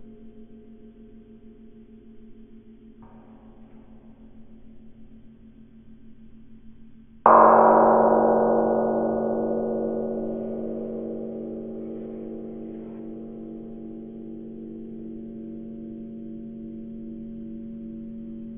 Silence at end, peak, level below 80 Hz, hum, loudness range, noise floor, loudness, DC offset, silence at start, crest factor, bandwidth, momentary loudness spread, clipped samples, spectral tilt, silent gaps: 0 s; 0 dBFS; -54 dBFS; none; 19 LU; -48 dBFS; -22 LUFS; under 0.1%; 0 s; 26 dB; 3.3 kHz; 22 LU; under 0.1%; -8.5 dB/octave; none